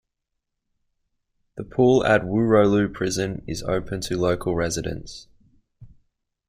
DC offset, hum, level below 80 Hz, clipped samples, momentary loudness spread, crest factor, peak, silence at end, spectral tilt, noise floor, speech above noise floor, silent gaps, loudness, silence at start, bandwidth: under 0.1%; none; -46 dBFS; under 0.1%; 18 LU; 18 dB; -6 dBFS; 0.65 s; -5.5 dB/octave; -80 dBFS; 59 dB; none; -22 LUFS; 1.55 s; 15 kHz